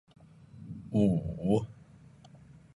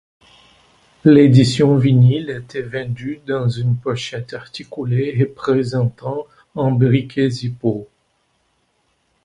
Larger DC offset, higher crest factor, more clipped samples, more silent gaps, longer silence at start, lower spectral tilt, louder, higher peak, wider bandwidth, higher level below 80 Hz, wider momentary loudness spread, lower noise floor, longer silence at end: neither; about the same, 20 dB vs 18 dB; neither; neither; second, 0.55 s vs 1.05 s; first, -9.5 dB/octave vs -7.5 dB/octave; second, -30 LUFS vs -17 LUFS; second, -14 dBFS vs 0 dBFS; about the same, 11 kHz vs 11 kHz; about the same, -54 dBFS vs -52 dBFS; first, 19 LU vs 15 LU; second, -55 dBFS vs -65 dBFS; second, 1.05 s vs 1.4 s